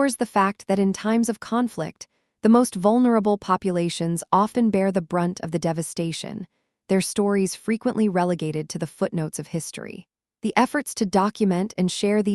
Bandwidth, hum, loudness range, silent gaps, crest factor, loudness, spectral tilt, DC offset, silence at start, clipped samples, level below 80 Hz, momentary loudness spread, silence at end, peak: 12.5 kHz; none; 4 LU; none; 20 dB; -23 LUFS; -5.5 dB/octave; under 0.1%; 0 s; under 0.1%; -62 dBFS; 12 LU; 0 s; -2 dBFS